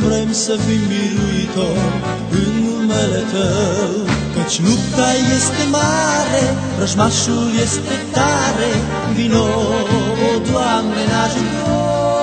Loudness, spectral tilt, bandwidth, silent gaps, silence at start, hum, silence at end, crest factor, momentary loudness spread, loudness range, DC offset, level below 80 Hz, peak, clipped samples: -16 LUFS; -4.5 dB/octave; 9.4 kHz; none; 0 s; none; 0 s; 16 dB; 4 LU; 2 LU; under 0.1%; -36 dBFS; 0 dBFS; under 0.1%